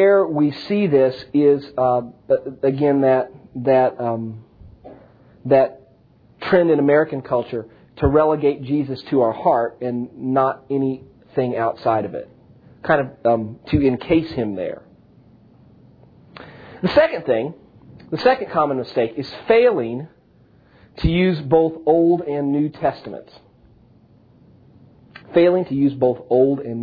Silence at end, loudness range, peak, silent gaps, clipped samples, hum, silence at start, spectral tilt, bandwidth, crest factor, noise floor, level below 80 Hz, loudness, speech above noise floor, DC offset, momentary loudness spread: 0 s; 5 LU; -2 dBFS; none; under 0.1%; none; 0 s; -9.5 dB/octave; 5 kHz; 18 dB; -53 dBFS; -44 dBFS; -19 LUFS; 35 dB; under 0.1%; 14 LU